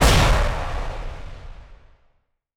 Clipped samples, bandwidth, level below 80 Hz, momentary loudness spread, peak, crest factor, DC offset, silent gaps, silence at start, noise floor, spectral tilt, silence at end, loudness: under 0.1%; 18 kHz; -24 dBFS; 25 LU; -6 dBFS; 16 dB; under 0.1%; none; 0 s; -65 dBFS; -4 dB/octave; 0.8 s; -22 LUFS